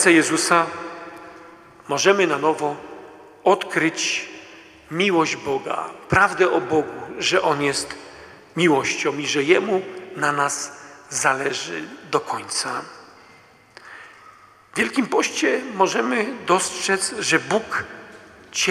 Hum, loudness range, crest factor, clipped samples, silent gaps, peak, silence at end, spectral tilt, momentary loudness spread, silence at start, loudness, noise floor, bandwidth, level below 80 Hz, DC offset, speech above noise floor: none; 5 LU; 20 dB; under 0.1%; none; -2 dBFS; 0 s; -3 dB/octave; 18 LU; 0 s; -21 LUFS; -50 dBFS; 14.5 kHz; -58 dBFS; under 0.1%; 30 dB